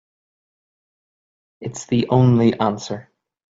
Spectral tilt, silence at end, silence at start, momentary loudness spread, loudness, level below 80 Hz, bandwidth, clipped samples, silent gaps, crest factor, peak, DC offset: -7.5 dB/octave; 0.5 s; 1.6 s; 17 LU; -18 LUFS; -54 dBFS; 7.8 kHz; under 0.1%; none; 18 dB; -4 dBFS; under 0.1%